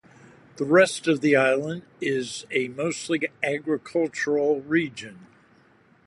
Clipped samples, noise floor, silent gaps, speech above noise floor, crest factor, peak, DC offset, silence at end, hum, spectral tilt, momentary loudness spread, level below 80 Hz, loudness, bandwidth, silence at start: under 0.1%; -58 dBFS; none; 34 dB; 20 dB; -6 dBFS; under 0.1%; 0.8 s; none; -5 dB/octave; 12 LU; -70 dBFS; -24 LUFS; 11.5 kHz; 0.55 s